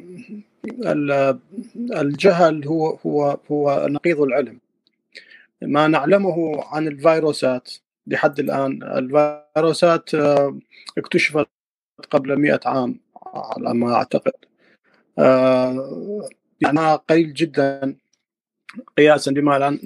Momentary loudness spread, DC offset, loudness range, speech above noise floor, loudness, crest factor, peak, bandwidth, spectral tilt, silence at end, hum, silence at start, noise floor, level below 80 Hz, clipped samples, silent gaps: 15 LU; under 0.1%; 3 LU; 62 dB; -19 LUFS; 18 dB; -2 dBFS; 12.5 kHz; -6 dB/octave; 0 s; none; 0.05 s; -80 dBFS; -68 dBFS; under 0.1%; 11.51-11.96 s